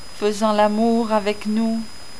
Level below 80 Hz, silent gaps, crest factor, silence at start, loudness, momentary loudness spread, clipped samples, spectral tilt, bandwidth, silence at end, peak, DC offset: -52 dBFS; none; 14 dB; 0 s; -20 LUFS; 7 LU; under 0.1%; -5.5 dB/octave; 11 kHz; 0 s; -4 dBFS; 3%